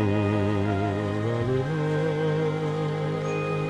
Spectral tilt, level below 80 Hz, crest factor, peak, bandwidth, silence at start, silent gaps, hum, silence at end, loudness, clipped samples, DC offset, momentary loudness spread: -8 dB/octave; -52 dBFS; 12 dB; -12 dBFS; 10 kHz; 0 s; none; none; 0 s; -26 LUFS; under 0.1%; under 0.1%; 3 LU